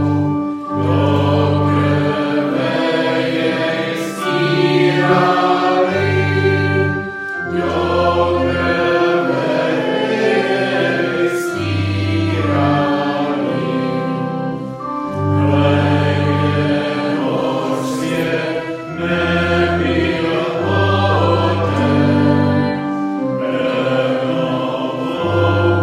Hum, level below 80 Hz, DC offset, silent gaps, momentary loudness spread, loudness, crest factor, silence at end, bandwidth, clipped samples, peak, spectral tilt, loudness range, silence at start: none; -50 dBFS; under 0.1%; none; 6 LU; -16 LUFS; 14 dB; 0 s; 14 kHz; under 0.1%; -2 dBFS; -7 dB/octave; 3 LU; 0 s